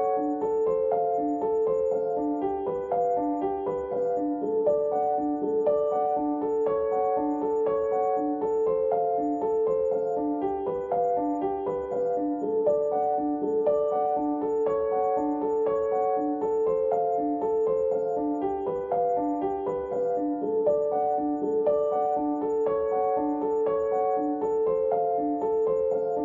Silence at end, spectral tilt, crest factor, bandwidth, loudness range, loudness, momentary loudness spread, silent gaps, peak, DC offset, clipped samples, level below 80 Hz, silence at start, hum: 0 s; -9 dB/octave; 12 dB; 7.2 kHz; 1 LU; -26 LUFS; 3 LU; none; -14 dBFS; under 0.1%; under 0.1%; -60 dBFS; 0 s; none